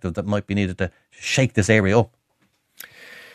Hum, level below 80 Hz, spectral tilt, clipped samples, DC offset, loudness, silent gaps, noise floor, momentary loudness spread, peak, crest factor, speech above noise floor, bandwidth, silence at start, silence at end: none; -50 dBFS; -5.5 dB/octave; under 0.1%; under 0.1%; -21 LUFS; none; -67 dBFS; 24 LU; -2 dBFS; 22 dB; 46 dB; 14 kHz; 0.05 s; 0.15 s